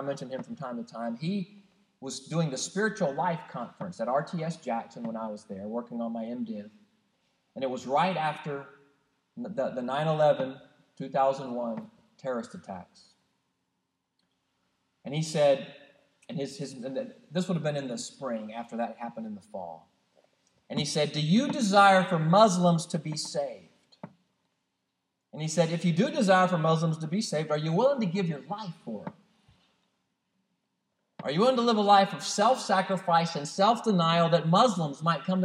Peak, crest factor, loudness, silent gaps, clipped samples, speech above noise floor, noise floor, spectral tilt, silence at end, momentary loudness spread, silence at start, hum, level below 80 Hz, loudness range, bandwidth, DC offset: -8 dBFS; 22 dB; -28 LUFS; none; under 0.1%; 53 dB; -81 dBFS; -5.5 dB/octave; 0 s; 17 LU; 0 s; none; -82 dBFS; 11 LU; 11.5 kHz; under 0.1%